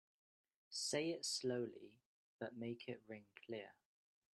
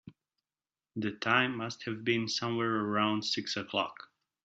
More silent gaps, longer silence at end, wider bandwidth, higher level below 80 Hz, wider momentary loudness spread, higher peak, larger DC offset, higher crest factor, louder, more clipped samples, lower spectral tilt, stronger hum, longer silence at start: first, 2.06-2.39 s vs none; first, 0.65 s vs 0.4 s; first, 12.5 kHz vs 8 kHz; second, -88 dBFS vs -76 dBFS; first, 16 LU vs 10 LU; second, -28 dBFS vs -12 dBFS; neither; about the same, 20 dB vs 22 dB; second, -45 LUFS vs -32 LUFS; neither; about the same, -3 dB/octave vs -2.5 dB/octave; neither; first, 0.7 s vs 0.05 s